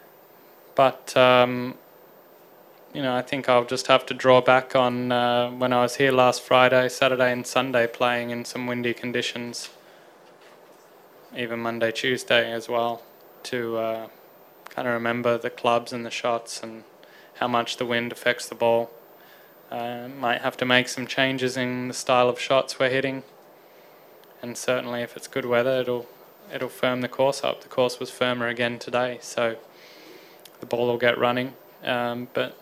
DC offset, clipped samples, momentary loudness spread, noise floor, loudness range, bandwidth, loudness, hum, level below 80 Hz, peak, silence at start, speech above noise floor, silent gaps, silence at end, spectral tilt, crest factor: under 0.1%; under 0.1%; 14 LU; -51 dBFS; 7 LU; 15.5 kHz; -24 LUFS; none; -70 dBFS; 0 dBFS; 0.75 s; 28 dB; none; 0.05 s; -4 dB/octave; 24 dB